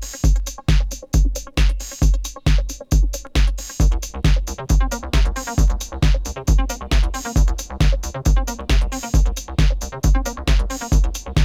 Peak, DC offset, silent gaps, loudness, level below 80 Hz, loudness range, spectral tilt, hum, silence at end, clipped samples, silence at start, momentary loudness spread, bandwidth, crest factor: -2 dBFS; under 0.1%; none; -21 LUFS; -18 dBFS; 0 LU; -5 dB/octave; none; 0 s; under 0.1%; 0 s; 2 LU; 15 kHz; 14 dB